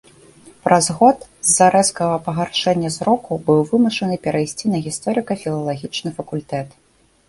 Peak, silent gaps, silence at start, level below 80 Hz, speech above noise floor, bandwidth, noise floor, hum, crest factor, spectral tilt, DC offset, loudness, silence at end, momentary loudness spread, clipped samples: 0 dBFS; none; 0.65 s; -54 dBFS; 28 dB; 12 kHz; -46 dBFS; none; 18 dB; -4 dB/octave; under 0.1%; -18 LUFS; 0.6 s; 12 LU; under 0.1%